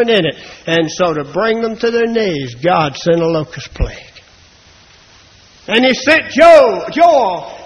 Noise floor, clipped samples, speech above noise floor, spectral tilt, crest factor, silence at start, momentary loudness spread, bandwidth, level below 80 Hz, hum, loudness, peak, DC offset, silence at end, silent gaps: -44 dBFS; 0.3%; 32 dB; -5 dB/octave; 14 dB; 0 s; 15 LU; 11 kHz; -34 dBFS; none; -12 LUFS; 0 dBFS; under 0.1%; 0 s; none